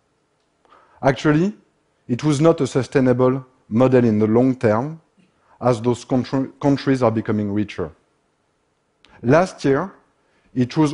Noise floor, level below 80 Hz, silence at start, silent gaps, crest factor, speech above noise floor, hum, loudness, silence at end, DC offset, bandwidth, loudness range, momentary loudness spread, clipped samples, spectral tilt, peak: -67 dBFS; -52 dBFS; 1 s; none; 18 dB; 49 dB; none; -19 LUFS; 0 s; under 0.1%; 11 kHz; 5 LU; 11 LU; under 0.1%; -7.5 dB/octave; -2 dBFS